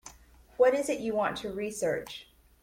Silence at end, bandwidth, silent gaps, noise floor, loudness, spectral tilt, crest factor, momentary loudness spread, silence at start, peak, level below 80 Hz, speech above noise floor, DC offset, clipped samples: 0.4 s; 16.5 kHz; none; -56 dBFS; -29 LUFS; -4 dB/octave; 18 dB; 20 LU; 0.05 s; -12 dBFS; -60 dBFS; 26 dB; under 0.1%; under 0.1%